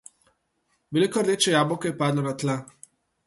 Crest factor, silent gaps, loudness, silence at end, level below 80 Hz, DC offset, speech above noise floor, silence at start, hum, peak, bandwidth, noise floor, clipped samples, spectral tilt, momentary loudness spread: 18 dB; none; -24 LUFS; 0.65 s; -66 dBFS; under 0.1%; 49 dB; 0.9 s; none; -8 dBFS; 12 kHz; -72 dBFS; under 0.1%; -4.5 dB/octave; 8 LU